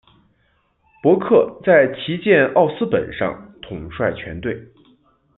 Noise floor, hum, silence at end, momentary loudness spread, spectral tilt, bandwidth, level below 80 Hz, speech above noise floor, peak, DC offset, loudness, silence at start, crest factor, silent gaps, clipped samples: -63 dBFS; none; 0.7 s; 17 LU; -11 dB/octave; 4.1 kHz; -50 dBFS; 46 dB; -2 dBFS; under 0.1%; -18 LUFS; 1.05 s; 18 dB; none; under 0.1%